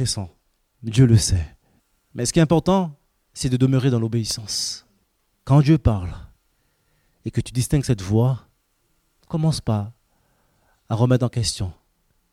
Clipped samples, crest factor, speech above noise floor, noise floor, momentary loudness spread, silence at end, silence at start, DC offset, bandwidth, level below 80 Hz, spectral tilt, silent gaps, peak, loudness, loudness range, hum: under 0.1%; 18 dB; 48 dB; -67 dBFS; 19 LU; 0.6 s; 0 s; under 0.1%; 15 kHz; -40 dBFS; -6 dB/octave; none; -4 dBFS; -21 LUFS; 4 LU; none